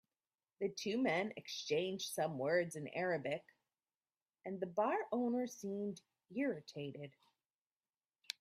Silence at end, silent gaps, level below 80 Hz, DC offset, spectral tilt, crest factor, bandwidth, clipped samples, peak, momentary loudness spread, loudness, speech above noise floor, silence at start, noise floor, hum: 0.1 s; 7.55-7.70 s, 7.76-7.80 s; -86 dBFS; under 0.1%; -4.5 dB/octave; 22 dB; 15.5 kHz; under 0.1%; -20 dBFS; 12 LU; -40 LUFS; over 50 dB; 0.6 s; under -90 dBFS; none